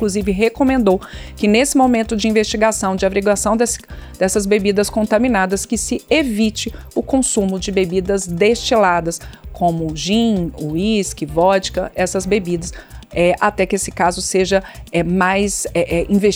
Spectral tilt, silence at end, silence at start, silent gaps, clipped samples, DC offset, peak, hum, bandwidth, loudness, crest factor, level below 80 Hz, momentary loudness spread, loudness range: -4.5 dB/octave; 0 s; 0 s; none; under 0.1%; under 0.1%; -2 dBFS; none; over 20 kHz; -17 LUFS; 16 dB; -36 dBFS; 8 LU; 2 LU